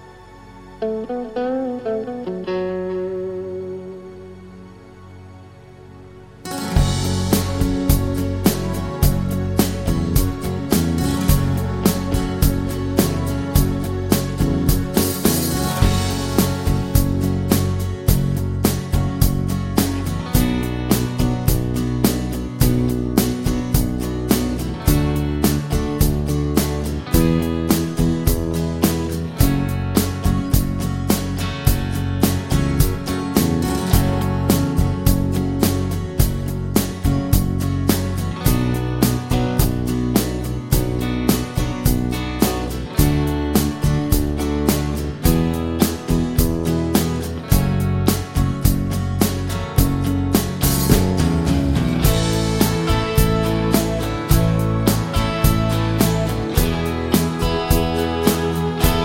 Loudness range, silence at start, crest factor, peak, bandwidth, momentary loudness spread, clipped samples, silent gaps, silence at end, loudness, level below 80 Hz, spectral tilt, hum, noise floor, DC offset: 3 LU; 0 s; 18 dB; 0 dBFS; 17 kHz; 6 LU; under 0.1%; none; 0 s; -20 LUFS; -26 dBFS; -5.5 dB/octave; none; -41 dBFS; under 0.1%